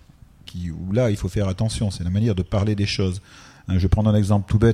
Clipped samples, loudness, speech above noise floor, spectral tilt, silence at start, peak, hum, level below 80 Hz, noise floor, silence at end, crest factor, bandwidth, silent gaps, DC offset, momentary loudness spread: under 0.1%; -22 LUFS; 26 dB; -7 dB/octave; 0.55 s; -4 dBFS; none; -36 dBFS; -46 dBFS; 0 s; 18 dB; 11 kHz; none; under 0.1%; 13 LU